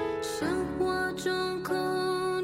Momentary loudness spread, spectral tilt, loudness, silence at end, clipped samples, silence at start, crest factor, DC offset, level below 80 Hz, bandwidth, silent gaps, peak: 2 LU; -4.5 dB/octave; -30 LUFS; 0 s; under 0.1%; 0 s; 14 dB; under 0.1%; -56 dBFS; 16 kHz; none; -16 dBFS